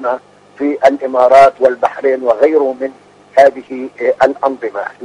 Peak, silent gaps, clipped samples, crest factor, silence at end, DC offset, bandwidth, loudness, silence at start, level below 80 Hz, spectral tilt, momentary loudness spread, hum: 0 dBFS; none; 0.5%; 12 dB; 0 s; under 0.1%; 10.5 kHz; -12 LUFS; 0 s; -54 dBFS; -5 dB/octave; 15 LU; 50 Hz at -55 dBFS